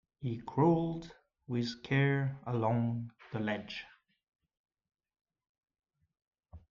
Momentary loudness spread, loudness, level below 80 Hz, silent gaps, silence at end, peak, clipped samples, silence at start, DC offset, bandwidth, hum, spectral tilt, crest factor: 15 LU; -34 LUFS; -66 dBFS; 4.28-4.32 s, 4.59-4.64 s, 5.21-5.25 s, 5.49-5.55 s, 6.27-6.31 s; 0.15 s; -16 dBFS; under 0.1%; 0.2 s; under 0.1%; 7.2 kHz; none; -8 dB/octave; 20 dB